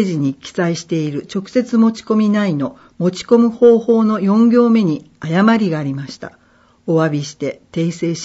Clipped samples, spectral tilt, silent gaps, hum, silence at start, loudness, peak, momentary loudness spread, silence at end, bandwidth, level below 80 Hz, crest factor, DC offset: under 0.1%; -7 dB/octave; none; none; 0 s; -16 LUFS; 0 dBFS; 13 LU; 0 s; 8 kHz; -60 dBFS; 14 dB; under 0.1%